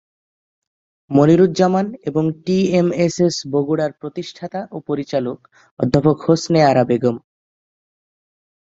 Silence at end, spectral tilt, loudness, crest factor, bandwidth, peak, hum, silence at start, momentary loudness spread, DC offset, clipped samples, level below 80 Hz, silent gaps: 1.45 s; -6.5 dB/octave; -17 LUFS; 16 dB; 7.8 kHz; -2 dBFS; none; 1.1 s; 15 LU; under 0.1%; under 0.1%; -52 dBFS; 5.71-5.77 s